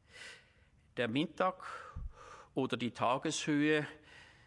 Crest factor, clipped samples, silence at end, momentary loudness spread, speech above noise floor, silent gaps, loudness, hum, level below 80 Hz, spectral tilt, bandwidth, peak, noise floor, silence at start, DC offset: 18 dB; under 0.1%; 0.2 s; 19 LU; 32 dB; none; -35 LUFS; none; -58 dBFS; -4.5 dB/octave; 11.5 kHz; -18 dBFS; -67 dBFS; 0.15 s; under 0.1%